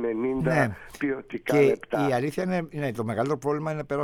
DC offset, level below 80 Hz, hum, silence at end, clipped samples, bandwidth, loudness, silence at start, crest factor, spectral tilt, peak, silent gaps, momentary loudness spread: under 0.1%; -54 dBFS; none; 0 s; under 0.1%; 16.5 kHz; -26 LUFS; 0 s; 18 dB; -7 dB/octave; -8 dBFS; none; 8 LU